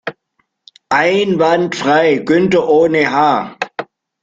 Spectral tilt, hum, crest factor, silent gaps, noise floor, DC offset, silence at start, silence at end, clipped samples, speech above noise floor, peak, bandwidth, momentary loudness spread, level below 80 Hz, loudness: -5.5 dB/octave; none; 14 dB; none; -65 dBFS; under 0.1%; 0.05 s; 0.4 s; under 0.1%; 53 dB; 0 dBFS; 7.8 kHz; 12 LU; -56 dBFS; -13 LUFS